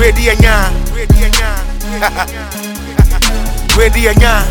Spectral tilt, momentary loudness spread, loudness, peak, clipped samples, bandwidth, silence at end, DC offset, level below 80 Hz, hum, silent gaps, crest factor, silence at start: -4.5 dB/octave; 11 LU; -12 LUFS; 0 dBFS; 0.5%; 18.5 kHz; 0 s; under 0.1%; -12 dBFS; none; none; 10 dB; 0 s